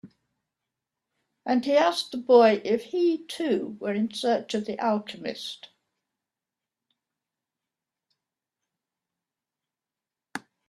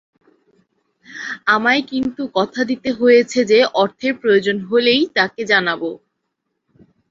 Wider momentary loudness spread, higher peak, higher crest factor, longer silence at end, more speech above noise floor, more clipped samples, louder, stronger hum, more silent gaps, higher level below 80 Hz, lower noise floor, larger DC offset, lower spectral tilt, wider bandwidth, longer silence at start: first, 19 LU vs 9 LU; second, -6 dBFS vs -2 dBFS; first, 22 dB vs 16 dB; second, 0.3 s vs 1.15 s; first, 65 dB vs 58 dB; neither; second, -25 LUFS vs -16 LUFS; neither; neither; second, -76 dBFS vs -60 dBFS; first, -90 dBFS vs -74 dBFS; neither; about the same, -5 dB/octave vs -4 dB/octave; first, 13 kHz vs 7.6 kHz; second, 0.05 s vs 1.1 s